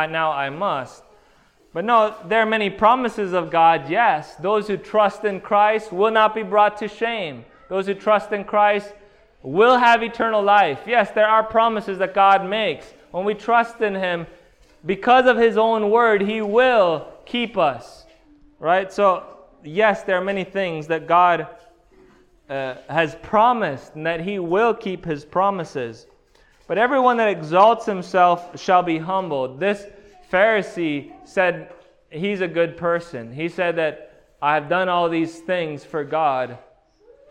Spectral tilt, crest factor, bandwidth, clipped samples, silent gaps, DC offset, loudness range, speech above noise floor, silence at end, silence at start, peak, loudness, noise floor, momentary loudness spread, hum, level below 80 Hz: -5.5 dB/octave; 18 dB; 10.5 kHz; under 0.1%; none; under 0.1%; 5 LU; 36 dB; 0.7 s; 0 s; -2 dBFS; -19 LUFS; -56 dBFS; 12 LU; none; -56 dBFS